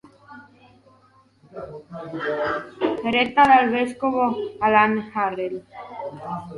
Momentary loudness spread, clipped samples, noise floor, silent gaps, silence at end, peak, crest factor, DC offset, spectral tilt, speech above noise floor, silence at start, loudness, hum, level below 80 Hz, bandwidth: 21 LU; under 0.1%; -57 dBFS; none; 0 s; -4 dBFS; 20 dB; under 0.1%; -6 dB/octave; 35 dB; 0.3 s; -21 LUFS; none; -58 dBFS; 11 kHz